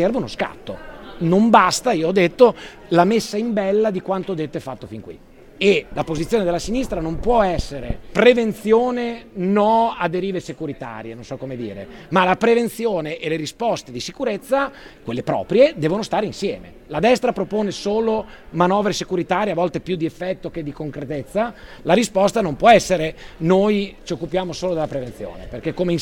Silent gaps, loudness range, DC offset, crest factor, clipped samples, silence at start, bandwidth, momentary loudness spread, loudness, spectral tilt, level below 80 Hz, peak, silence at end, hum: none; 5 LU; under 0.1%; 20 dB; under 0.1%; 0 s; 17 kHz; 15 LU; -20 LUFS; -5.5 dB/octave; -42 dBFS; 0 dBFS; 0 s; none